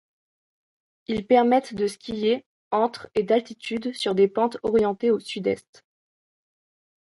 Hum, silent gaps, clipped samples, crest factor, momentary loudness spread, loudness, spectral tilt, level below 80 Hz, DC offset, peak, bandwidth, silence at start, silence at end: none; 2.46-2.71 s; under 0.1%; 18 dB; 10 LU; -24 LUFS; -5.5 dB/octave; -60 dBFS; under 0.1%; -6 dBFS; 11.5 kHz; 1.1 s; 1.6 s